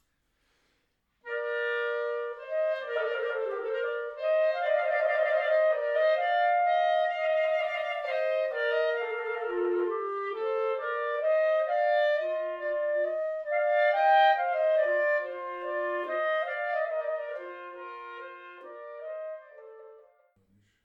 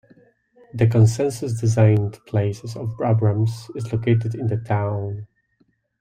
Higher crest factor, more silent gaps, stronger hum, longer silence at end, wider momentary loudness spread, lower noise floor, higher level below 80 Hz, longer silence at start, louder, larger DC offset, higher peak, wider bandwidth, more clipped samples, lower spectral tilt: about the same, 16 dB vs 18 dB; neither; neither; about the same, 0.85 s vs 0.75 s; about the same, 14 LU vs 13 LU; first, -75 dBFS vs -65 dBFS; second, -78 dBFS vs -54 dBFS; first, 1.25 s vs 0.75 s; second, -28 LUFS vs -21 LUFS; neither; second, -12 dBFS vs -4 dBFS; second, 5.6 kHz vs 10.5 kHz; neither; second, -3 dB/octave vs -7.5 dB/octave